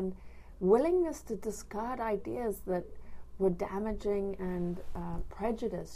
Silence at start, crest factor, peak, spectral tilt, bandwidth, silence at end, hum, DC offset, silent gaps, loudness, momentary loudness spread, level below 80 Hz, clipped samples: 0 s; 20 dB; -14 dBFS; -7 dB/octave; 15.5 kHz; 0 s; none; under 0.1%; none; -34 LUFS; 13 LU; -48 dBFS; under 0.1%